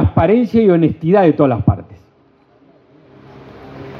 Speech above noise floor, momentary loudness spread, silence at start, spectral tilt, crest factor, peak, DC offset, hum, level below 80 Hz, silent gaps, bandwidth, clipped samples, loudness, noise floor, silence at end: 40 dB; 14 LU; 0 s; -10.5 dB/octave; 16 dB; 0 dBFS; under 0.1%; none; -40 dBFS; none; 6.2 kHz; under 0.1%; -13 LUFS; -52 dBFS; 0 s